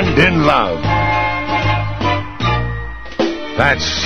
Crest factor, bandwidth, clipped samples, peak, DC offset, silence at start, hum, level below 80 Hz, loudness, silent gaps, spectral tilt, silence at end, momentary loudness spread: 16 dB; 8.4 kHz; under 0.1%; 0 dBFS; 3%; 0 s; none; -30 dBFS; -16 LUFS; none; -5.5 dB/octave; 0 s; 8 LU